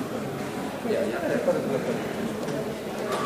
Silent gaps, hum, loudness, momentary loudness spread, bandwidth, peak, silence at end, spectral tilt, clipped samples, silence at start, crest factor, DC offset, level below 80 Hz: none; none; -28 LUFS; 6 LU; 15.5 kHz; -12 dBFS; 0 s; -5.5 dB/octave; under 0.1%; 0 s; 16 dB; under 0.1%; -60 dBFS